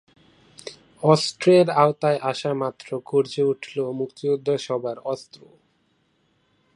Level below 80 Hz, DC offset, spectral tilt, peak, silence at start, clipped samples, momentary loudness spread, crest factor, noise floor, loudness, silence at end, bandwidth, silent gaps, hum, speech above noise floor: -70 dBFS; under 0.1%; -6 dB/octave; -2 dBFS; 0.65 s; under 0.1%; 16 LU; 22 dB; -67 dBFS; -22 LUFS; 1.55 s; 11.5 kHz; none; none; 45 dB